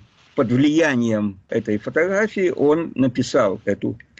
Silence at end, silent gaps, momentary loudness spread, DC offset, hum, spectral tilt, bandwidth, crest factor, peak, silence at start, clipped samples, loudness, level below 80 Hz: 0.25 s; none; 7 LU; under 0.1%; none; -6.5 dB/octave; 8.2 kHz; 12 dB; -8 dBFS; 0.35 s; under 0.1%; -20 LUFS; -56 dBFS